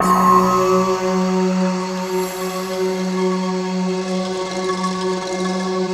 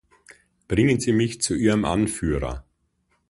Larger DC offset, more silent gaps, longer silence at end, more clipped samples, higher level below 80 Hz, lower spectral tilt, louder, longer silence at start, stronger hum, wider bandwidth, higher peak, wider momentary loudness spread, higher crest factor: neither; neither; second, 0 s vs 0.7 s; neither; second, -52 dBFS vs -40 dBFS; about the same, -5.5 dB/octave vs -5.5 dB/octave; first, -19 LUFS vs -22 LUFS; second, 0 s vs 0.7 s; neither; first, 15.5 kHz vs 11.5 kHz; first, 0 dBFS vs -6 dBFS; about the same, 9 LU vs 8 LU; about the same, 18 dB vs 16 dB